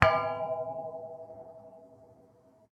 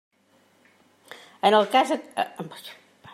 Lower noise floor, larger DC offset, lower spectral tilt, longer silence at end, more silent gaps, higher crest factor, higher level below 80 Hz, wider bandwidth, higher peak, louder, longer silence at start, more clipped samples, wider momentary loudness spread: about the same, -61 dBFS vs -62 dBFS; neither; first, -6 dB/octave vs -4 dB/octave; first, 0.7 s vs 0.4 s; neither; first, 32 dB vs 22 dB; first, -54 dBFS vs -82 dBFS; second, 11 kHz vs 15.5 kHz; first, -2 dBFS vs -6 dBFS; second, -33 LUFS vs -23 LUFS; second, 0 s vs 1.45 s; neither; second, 22 LU vs 25 LU